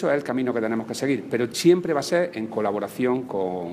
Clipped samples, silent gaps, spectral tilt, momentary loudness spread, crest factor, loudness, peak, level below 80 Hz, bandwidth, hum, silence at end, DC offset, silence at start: under 0.1%; none; -5.5 dB/octave; 7 LU; 18 dB; -24 LUFS; -6 dBFS; -68 dBFS; 15.5 kHz; none; 0 s; under 0.1%; 0 s